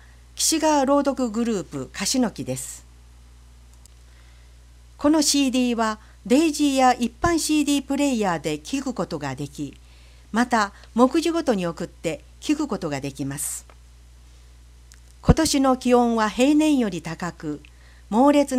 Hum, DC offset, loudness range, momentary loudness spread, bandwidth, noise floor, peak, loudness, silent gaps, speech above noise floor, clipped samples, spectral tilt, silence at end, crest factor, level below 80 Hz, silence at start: 60 Hz at -45 dBFS; under 0.1%; 8 LU; 13 LU; 16 kHz; -48 dBFS; -2 dBFS; -22 LUFS; none; 26 dB; under 0.1%; -4 dB/octave; 0 s; 22 dB; -42 dBFS; 0.35 s